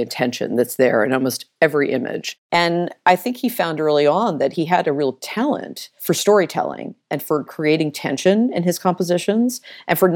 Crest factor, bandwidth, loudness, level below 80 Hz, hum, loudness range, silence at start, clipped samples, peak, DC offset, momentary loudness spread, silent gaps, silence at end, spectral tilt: 16 dB; 18 kHz; -19 LUFS; -68 dBFS; none; 2 LU; 0 s; under 0.1%; -2 dBFS; under 0.1%; 9 LU; 2.38-2.50 s; 0 s; -5 dB/octave